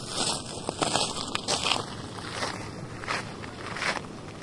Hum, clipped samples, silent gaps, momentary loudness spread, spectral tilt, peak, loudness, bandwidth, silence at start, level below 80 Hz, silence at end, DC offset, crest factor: none; under 0.1%; none; 12 LU; -2.5 dB/octave; -4 dBFS; -30 LUFS; 11.5 kHz; 0 s; -54 dBFS; 0 s; under 0.1%; 28 dB